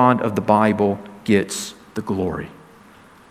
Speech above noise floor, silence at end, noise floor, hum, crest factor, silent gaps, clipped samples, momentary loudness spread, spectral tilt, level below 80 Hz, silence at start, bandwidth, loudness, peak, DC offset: 29 dB; 0.75 s; -47 dBFS; none; 20 dB; none; under 0.1%; 14 LU; -5.5 dB/octave; -54 dBFS; 0 s; 16 kHz; -21 LUFS; 0 dBFS; under 0.1%